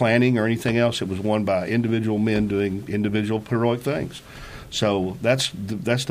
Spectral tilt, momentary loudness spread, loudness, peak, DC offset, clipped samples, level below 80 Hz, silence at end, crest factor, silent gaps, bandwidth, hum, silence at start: -6 dB/octave; 8 LU; -23 LUFS; -4 dBFS; under 0.1%; under 0.1%; -50 dBFS; 0 s; 18 dB; none; 15.5 kHz; none; 0 s